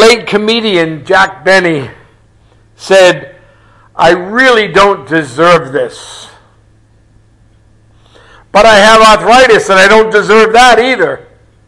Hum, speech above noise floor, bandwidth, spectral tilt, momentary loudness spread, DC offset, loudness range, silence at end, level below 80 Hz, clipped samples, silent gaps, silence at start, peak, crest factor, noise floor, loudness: none; 38 dB; 12 kHz; -3.5 dB/octave; 14 LU; under 0.1%; 9 LU; 0.45 s; -38 dBFS; 2%; none; 0 s; 0 dBFS; 8 dB; -45 dBFS; -6 LUFS